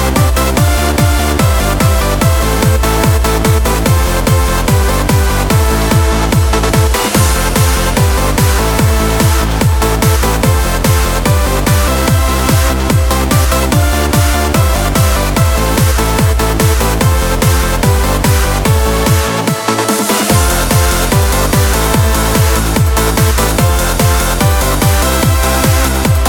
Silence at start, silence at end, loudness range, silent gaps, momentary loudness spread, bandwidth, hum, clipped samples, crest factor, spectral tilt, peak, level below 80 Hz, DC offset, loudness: 0 s; 0 s; 0 LU; none; 1 LU; 19.5 kHz; none; under 0.1%; 10 dB; -4.5 dB/octave; 0 dBFS; -14 dBFS; under 0.1%; -11 LUFS